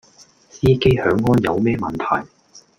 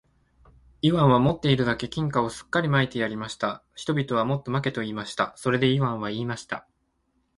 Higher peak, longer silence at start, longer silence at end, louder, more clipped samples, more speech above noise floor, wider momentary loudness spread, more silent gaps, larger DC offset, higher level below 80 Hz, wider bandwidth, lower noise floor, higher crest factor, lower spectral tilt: first, -2 dBFS vs -6 dBFS; second, 0.55 s vs 0.85 s; second, 0.2 s vs 0.75 s; first, -18 LUFS vs -25 LUFS; neither; second, 33 dB vs 47 dB; second, 7 LU vs 10 LU; neither; neither; first, -42 dBFS vs -54 dBFS; first, 15 kHz vs 11.5 kHz; second, -50 dBFS vs -71 dBFS; about the same, 16 dB vs 20 dB; about the same, -7.5 dB/octave vs -6.5 dB/octave